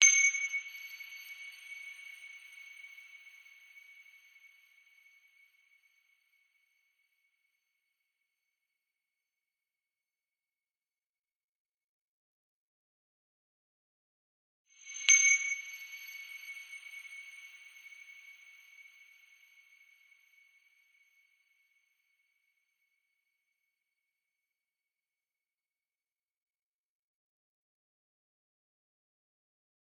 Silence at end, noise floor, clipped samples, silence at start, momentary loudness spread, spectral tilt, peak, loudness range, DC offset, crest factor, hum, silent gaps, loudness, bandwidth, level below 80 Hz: 12.1 s; under -90 dBFS; under 0.1%; 0 s; 31 LU; 10 dB/octave; -6 dBFS; 24 LU; under 0.1%; 34 dB; none; 11.49-11.53 s, 11.60-11.65 s, 11.84-14.65 s; -28 LUFS; 18 kHz; under -90 dBFS